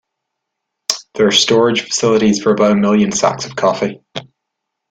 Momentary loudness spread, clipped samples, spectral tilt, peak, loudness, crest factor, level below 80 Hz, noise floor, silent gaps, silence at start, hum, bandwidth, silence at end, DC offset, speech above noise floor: 11 LU; under 0.1%; -4 dB/octave; 0 dBFS; -14 LUFS; 16 dB; -54 dBFS; -77 dBFS; none; 0.9 s; none; 14.5 kHz; 0.7 s; under 0.1%; 63 dB